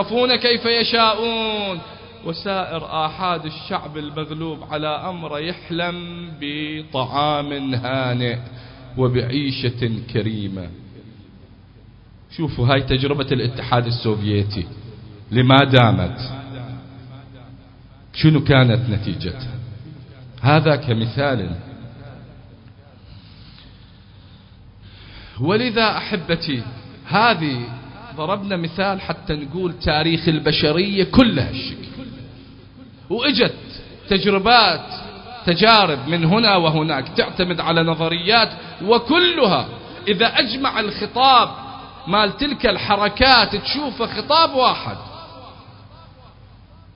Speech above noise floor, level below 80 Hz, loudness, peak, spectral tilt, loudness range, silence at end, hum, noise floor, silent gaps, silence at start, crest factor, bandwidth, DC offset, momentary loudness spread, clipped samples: 27 dB; -42 dBFS; -18 LUFS; 0 dBFS; -8.5 dB/octave; 8 LU; 0.5 s; none; -45 dBFS; none; 0 s; 20 dB; 5.4 kHz; under 0.1%; 20 LU; under 0.1%